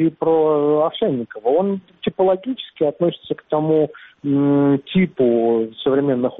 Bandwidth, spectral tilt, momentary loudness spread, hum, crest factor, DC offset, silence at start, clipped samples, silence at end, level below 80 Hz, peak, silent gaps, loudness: 4 kHz; -6.5 dB/octave; 8 LU; none; 12 dB; under 0.1%; 0 s; under 0.1%; 0 s; -58 dBFS; -6 dBFS; none; -19 LUFS